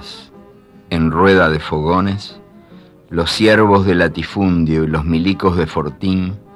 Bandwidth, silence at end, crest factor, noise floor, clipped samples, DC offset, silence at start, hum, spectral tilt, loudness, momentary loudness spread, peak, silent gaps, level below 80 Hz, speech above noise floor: 12.5 kHz; 0.15 s; 14 dB; -43 dBFS; under 0.1%; under 0.1%; 0 s; none; -6.5 dB/octave; -15 LUFS; 12 LU; -2 dBFS; none; -36 dBFS; 28 dB